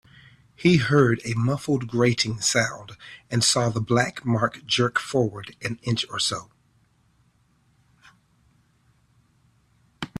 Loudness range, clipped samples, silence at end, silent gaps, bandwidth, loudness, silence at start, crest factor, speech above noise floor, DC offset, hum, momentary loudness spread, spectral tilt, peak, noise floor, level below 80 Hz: 9 LU; under 0.1%; 0.1 s; none; 14 kHz; -23 LUFS; 0.6 s; 20 dB; 40 dB; under 0.1%; none; 12 LU; -4.5 dB/octave; -4 dBFS; -64 dBFS; -58 dBFS